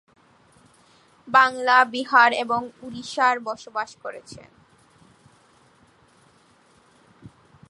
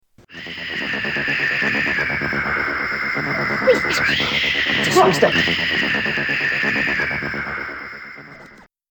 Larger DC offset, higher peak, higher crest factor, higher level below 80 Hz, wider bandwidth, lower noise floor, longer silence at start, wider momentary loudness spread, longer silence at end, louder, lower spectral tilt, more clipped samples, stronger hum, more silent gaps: neither; about the same, -2 dBFS vs 0 dBFS; about the same, 22 dB vs 20 dB; second, -68 dBFS vs -48 dBFS; second, 11.5 kHz vs 19.5 kHz; first, -58 dBFS vs -45 dBFS; first, 1.25 s vs 0.3 s; first, 20 LU vs 13 LU; about the same, 0.4 s vs 0.3 s; about the same, -20 LUFS vs -18 LUFS; about the same, -3 dB/octave vs -3.5 dB/octave; neither; neither; neither